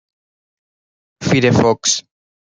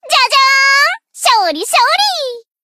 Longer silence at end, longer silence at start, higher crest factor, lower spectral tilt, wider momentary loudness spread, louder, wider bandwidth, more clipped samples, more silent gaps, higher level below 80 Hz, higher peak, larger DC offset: first, 0.4 s vs 0.25 s; first, 1.2 s vs 0.05 s; first, 18 dB vs 12 dB; first, -4 dB/octave vs 3 dB/octave; about the same, 8 LU vs 7 LU; second, -15 LUFS vs -10 LUFS; second, 10 kHz vs 16 kHz; neither; neither; first, -52 dBFS vs -72 dBFS; about the same, -2 dBFS vs 0 dBFS; neither